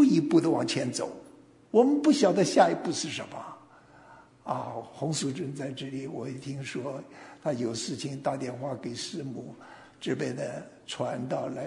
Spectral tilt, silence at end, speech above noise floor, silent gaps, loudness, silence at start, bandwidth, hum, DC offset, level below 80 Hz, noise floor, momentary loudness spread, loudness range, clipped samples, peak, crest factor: -5 dB/octave; 0 s; 26 dB; none; -29 LUFS; 0 s; 11 kHz; none; under 0.1%; -72 dBFS; -55 dBFS; 18 LU; 9 LU; under 0.1%; -8 dBFS; 22 dB